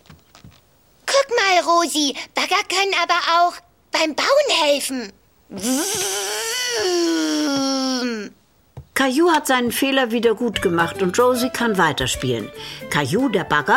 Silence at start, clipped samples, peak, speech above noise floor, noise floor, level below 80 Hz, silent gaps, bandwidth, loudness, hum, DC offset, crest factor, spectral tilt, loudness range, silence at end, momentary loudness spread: 0.45 s; under 0.1%; -4 dBFS; 37 dB; -55 dBFS; -50 dBFS; none; 16.5 kHz; -19 LUFS; none; under 0.1%; 16 dB; -3 dB/octave; 3 LU; 0 s; 10 LU